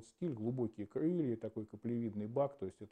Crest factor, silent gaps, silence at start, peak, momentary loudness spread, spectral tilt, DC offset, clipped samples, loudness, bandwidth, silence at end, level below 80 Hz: 16 dB; none; 0 s; -22 dBFS; 8 LU; -9.5 dB/octave; under 0.1%; under 0.1%; -40 LUFS; 9.6 kHz; 0.05 s; -78 dBFS